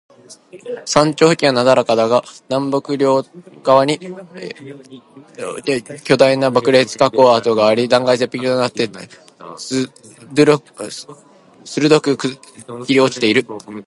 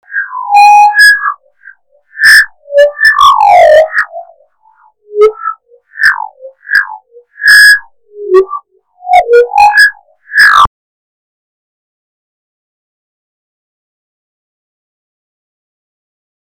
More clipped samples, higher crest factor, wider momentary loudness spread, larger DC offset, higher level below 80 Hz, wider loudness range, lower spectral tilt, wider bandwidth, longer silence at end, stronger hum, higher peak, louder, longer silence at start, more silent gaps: second, under 0.1% vs 4%; first, 16 dB vs 10 dB; first, 19 LU vs 16 LU; neither; second, -60 dBFS vs -44 dBFS; about the same, 5 LU vs 7 LU; first, -4.5 dB/octave vs -1 dB/octave; second, 11.5 kHz vs over 20 kHz; second, 0.05 s vs 5.75 s; neither; about the same, 0 dBFS vs 0 dBFS; second, -15 LUFS vs -5 LUFS; first, 0.3 s vs 0.1 s; neither